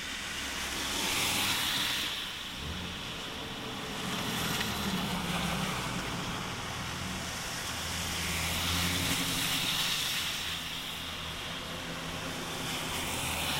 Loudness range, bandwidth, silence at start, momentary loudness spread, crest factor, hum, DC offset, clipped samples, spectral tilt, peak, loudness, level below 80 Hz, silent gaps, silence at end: 4 LU; 16 kHz; 0 s; 9 LU; 18 dB; none; under 0.1%; under 0.1%; -2.5 dB/octave; -16 dBFS; -32 LUFS; -50 dBFS; none; 0 s